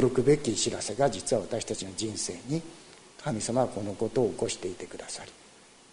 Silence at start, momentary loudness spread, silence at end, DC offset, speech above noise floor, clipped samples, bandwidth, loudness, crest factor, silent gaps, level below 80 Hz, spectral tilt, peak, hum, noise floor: 0 s; 15 LU; 0.45 s; under 0.1%; 26 dB; under 0.1%; 10.5 kHz; -30 LUFS; 20 dB; none; -56 dBFS; -4.5 dB/octave; -10 dBFS; none; -55 dBFS